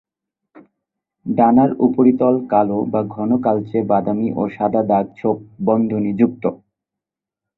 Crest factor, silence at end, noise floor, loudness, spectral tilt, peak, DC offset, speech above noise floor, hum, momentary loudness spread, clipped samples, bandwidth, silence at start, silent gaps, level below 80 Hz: 16 dB; 1 s; -86 dBFS; -17 LUFS; -12 dB/octave; -2 dBFS; under 0.1%; 69 dB; none; 8 LU; under 0.1%; 4.1 kHz; 1.25 s; none; -58 dBFS